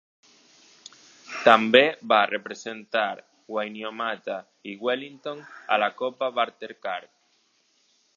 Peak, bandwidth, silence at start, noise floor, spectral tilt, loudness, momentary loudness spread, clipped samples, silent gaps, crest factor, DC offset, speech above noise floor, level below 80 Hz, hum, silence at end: 0 dBFS; 8 kHz; 1.3 s; -67 dBFS; -4 dB/octave; -24 LUFS; 18 LU; under 0.1%; none; 26 dB; under 0.1%; 42 dB; -84 dBFS; none; 1.1 s